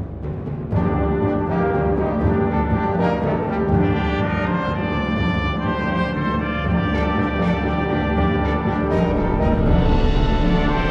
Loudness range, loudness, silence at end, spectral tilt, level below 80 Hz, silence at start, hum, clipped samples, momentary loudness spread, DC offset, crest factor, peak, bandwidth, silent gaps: 2 LU; -20 LUFS; 0 s; -8.5 dB/octave; -26 dBFS; 0 s; none; under 0.1%; 3 LU; under 0.1%; 14 dB; -6 dBFS; 6.8 kHz; none